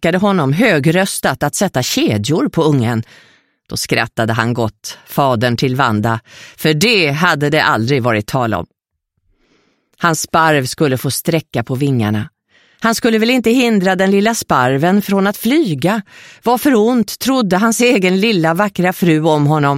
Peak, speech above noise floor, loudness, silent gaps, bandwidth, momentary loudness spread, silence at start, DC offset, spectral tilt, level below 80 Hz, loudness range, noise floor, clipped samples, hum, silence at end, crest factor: 0 dBFS; 57 dB; -14 LUFS; none; 16.5 kHz; 7 LU; 0 s; under 0.1%; -5 dB/octave; -50 dBFS; 4 LU; -71 dBFS; under 0.1%; none; 0 s; 14 dB